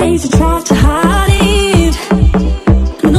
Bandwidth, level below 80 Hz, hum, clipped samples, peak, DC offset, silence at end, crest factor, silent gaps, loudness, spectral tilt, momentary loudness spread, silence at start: 15 kHz; -14 dBFS; none; under 0.1%; 0 dBFS; under 0.1%; 0 s; 10 dB; none; -11 LUFS; -5.5 dB/octave; 2 LU; 0 s